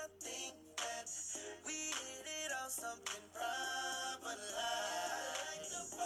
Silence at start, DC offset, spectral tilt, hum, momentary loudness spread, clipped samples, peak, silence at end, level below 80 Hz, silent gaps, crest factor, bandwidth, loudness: 0 s; under 0.1%; 0 dB/octave; none; 5 LU; under 0.1%; -28 dBFS; 0 s; -80 dBFS; none; 16 dB; over 20 kHz; -42 LUFS